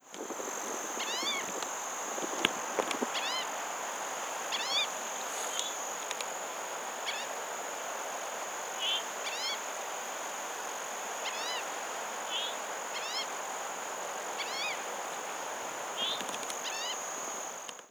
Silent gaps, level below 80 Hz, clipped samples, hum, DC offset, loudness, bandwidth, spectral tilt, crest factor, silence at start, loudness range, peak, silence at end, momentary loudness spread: none; -86 dBFS; under 0.1%; none; under 0.1%; -35 LUFS; over 20 kHz; 0.5 dB/octave; 34 dB; 0 s; 3 LU; -2 dBFS; 0 s; 6 LU